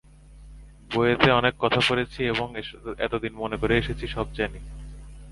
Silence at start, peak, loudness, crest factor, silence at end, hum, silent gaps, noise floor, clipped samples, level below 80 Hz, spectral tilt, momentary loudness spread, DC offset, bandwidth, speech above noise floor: 0.25 s; 0 dBFS; -24 LUFS; 26 dB; 0 s; none; none; -47 dBFS; under 0.1%; -42 dBFS; -5.5 dB/octave; 20 LU; under 0.1%; 11.5 kHz; 22 dB